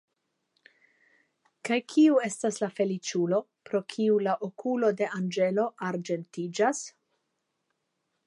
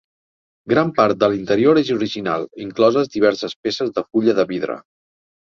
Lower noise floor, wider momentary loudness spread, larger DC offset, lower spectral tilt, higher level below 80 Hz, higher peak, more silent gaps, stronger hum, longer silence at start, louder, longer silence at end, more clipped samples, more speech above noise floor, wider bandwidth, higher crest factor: second, -80 dBFS vs under -90 dBFS; about the same, 11 LU vs 9 LU; neither; about the same, -5 dB/octave vs -6 dB/octave; second, -86 dBFS vs -58 dBFS; second, -12 dBFS vs -2 dBFS; second, none vs 3.56-3.63 s; neither; first, 1.65 s vs 0.65 s; second, -28 LUFS vs -18 LUFS; first, 1.35 s vs 0.6 s; neither; second, 53 dB vs over 72 dB; first, 11.5 kHz vs 7.2 kHz; about the same, 18 dB vs 18 dB